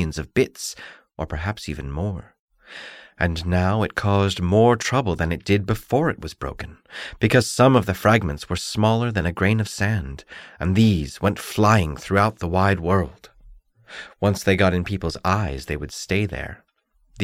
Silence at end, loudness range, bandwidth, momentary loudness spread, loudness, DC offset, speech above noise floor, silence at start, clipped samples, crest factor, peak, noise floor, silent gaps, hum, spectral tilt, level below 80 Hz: 0 s; 4 LU; 16 kHz; 18 LU; -21 LUFS; under 0.1%; 42 dB; 0 s; under 0.1%; 18 dB; -4 dBFS; -63 dBFS; 2.39-2.48 s; none; -6 dB/octave; -40 dBFS